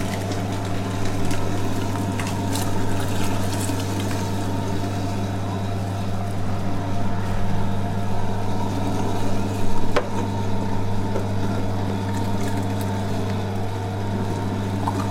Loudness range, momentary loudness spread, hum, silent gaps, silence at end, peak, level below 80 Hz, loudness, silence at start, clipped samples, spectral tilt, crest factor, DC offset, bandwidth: 1 LU; 2 LU; none; none; 0 s; -6 dBFS; -32 dBFS; -25 LUFS; 0 s; under 0.1%; -6 dB/octave; 14 dB; under 0.1%; 15.5 kHz